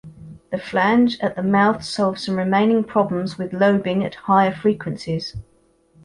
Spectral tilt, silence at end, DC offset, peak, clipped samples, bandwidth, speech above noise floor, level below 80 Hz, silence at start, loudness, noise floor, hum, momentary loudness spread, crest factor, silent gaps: -6.5 dB/octave; 0.6 s; under 0.1%; -4 dBFS; under 0.1%; 11 kHz; 38 dB; -52 dBFS; 0.05 s; -20 LUFS; -58 dBFS; none; 10 LU; 16 dB; none